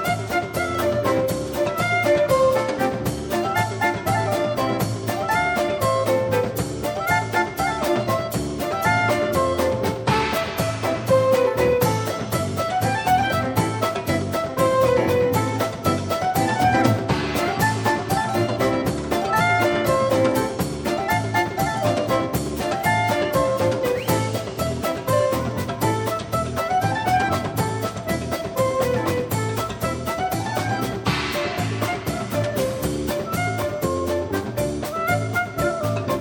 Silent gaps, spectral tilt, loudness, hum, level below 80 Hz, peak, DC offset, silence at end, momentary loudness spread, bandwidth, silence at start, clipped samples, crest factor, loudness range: none; -5.5 dB/octave; -22 LUFS; none; -44 dBFS; -4 dBFS; under 0.1%; 0 s; 6 LU; 17.5 kHz; 0 s; under 0.1%; 16 dB; 3 LU